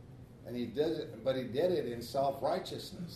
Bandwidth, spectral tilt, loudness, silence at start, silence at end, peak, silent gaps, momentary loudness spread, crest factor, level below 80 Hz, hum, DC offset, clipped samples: 13.5 kHz; -6 dB/octave; -35 LUFS; 0 s; 0 s; -18 dBFS; none; 11 LU; 16 dB; -64 dBFS; none; under 0.1%; under 0.1%